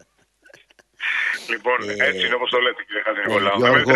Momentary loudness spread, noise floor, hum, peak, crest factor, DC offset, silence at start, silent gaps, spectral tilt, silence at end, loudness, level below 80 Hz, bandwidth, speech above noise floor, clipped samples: 7 LU; -56 dBFS; none; 0 dBFS; 20 dB; under 0.1%; 1 s; none; -4 dB/octave; 0 s; -20 LUFS; -62 dBFS; 12 kHz; 37 dB; under 0.1%